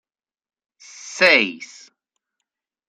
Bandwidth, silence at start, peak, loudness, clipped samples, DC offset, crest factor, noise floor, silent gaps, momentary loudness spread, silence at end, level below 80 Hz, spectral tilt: 13.5 kHz; 1.05 s; 0 dBFS; -15 LUFS; under 0.1%; under 0.1%; 24 dB; -81 dBFS; none; 25 LU; 1.25 s; -76 dBFS; -2 dB/octave